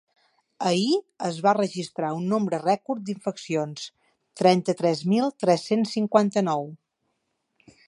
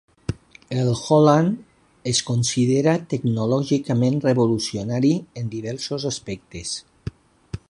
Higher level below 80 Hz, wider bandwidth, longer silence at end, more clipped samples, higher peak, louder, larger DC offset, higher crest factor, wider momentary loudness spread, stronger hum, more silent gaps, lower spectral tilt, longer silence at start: second, -74 dBFS vs -50 dBFS; about the same, 11.5 kHz vs 11.5 kHz; first, 1.15 s vs 0.1 s; neither; about the same, -4 dBFS vs -2 dBFS; second, -24 LUFS vs -21 LUFS; neither; about the same, 20 dB vs 20 dB; second, 10 LU vs 15 LU; neither; neither; about the same, -6 dB/octave vs -5.5 dB/octave; first, 0.6 s vs 0.3 s